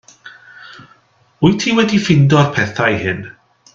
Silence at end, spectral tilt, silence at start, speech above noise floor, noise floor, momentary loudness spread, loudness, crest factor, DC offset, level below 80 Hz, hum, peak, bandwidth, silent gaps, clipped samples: 0.45 s; -6 dB/octave; 0.25 s; 39 dB; -52 dBFS; 10 LU; -14 LUFS; 16 dB; under 0.1%; -48 dBFS; none; 0 dBFS; 7.6 kHz; none; under 0.1%